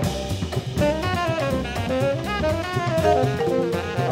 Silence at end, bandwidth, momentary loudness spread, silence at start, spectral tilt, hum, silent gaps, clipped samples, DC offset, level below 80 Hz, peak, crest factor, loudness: 0 s; 16 kHz; 6 LU; 0 s; -6 dB/octave; none; none; under 0.1%; under 0.1%; -38 dBFS; -6 dBFS; 16 dB; -23 LUFS